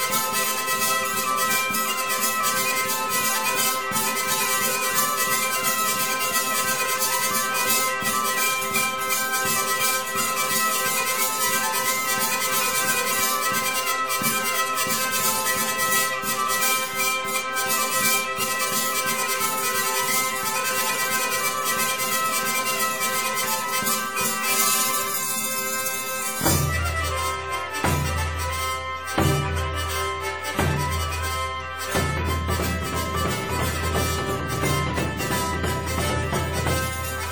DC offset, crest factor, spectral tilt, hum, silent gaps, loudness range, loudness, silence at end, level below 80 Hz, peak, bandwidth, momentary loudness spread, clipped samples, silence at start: 0.6%; 18 dB; -2 dB/octave; none; none; 4 LU; -22 LUFS; 0 s; -40 dBFS; -6 dBFS; over 20 kHz; 5 LU; under 0.1%; 0 s